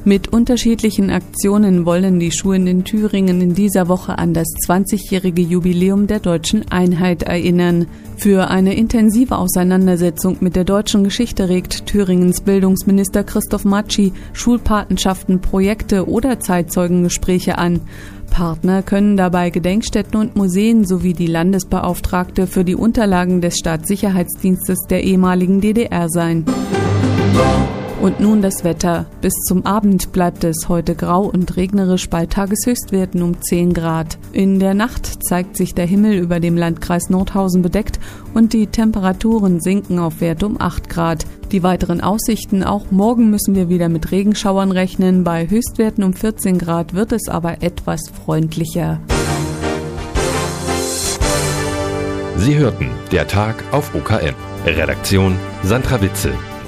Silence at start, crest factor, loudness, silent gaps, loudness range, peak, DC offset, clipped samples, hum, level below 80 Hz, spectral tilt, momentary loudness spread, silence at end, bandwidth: 0 s; 14 dB; -16 LUFS; none; 3 LU; 0 dBFS; under 0.1%; under 0.1%; none; -30 dBFS; -6 dB/octave; 6 LU; 0 s; 15.5 kHz